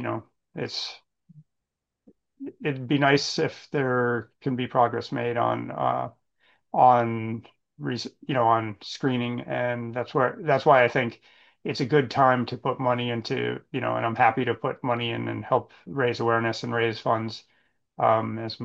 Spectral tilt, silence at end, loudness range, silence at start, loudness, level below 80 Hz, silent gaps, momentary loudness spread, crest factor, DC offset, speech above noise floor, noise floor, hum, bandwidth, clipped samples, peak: -6 dB/octave; 0 s; 4 LU; 0 s; -25 LUFS; -68 dBFS; none; 12 LU; 20 dB; under 0.1%; 59 dB; -84 dBFS; none; 8 kHz; under 0.1%; -6 dBFS